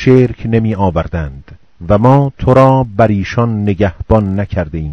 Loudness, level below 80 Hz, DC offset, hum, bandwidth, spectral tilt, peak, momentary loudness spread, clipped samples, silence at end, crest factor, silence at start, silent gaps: -12 LUFS; -30 dBFS; 0.6%; none; 6.6 kHz; -9 dB/octave; 0 dBFS; 10 LU; 1%; 0 s; 12 dB; 0 s; none